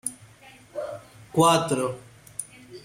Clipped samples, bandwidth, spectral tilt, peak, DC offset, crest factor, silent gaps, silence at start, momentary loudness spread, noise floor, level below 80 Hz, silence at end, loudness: under 0.1%; 16.5 kHz; -4.5 dB/octave; -6 dBFS; under 0.1%; 20 dB; none; 0.05 s; 21 LU; -51 dBFS; -62 dBFS; 0.05 s; -24 LUFS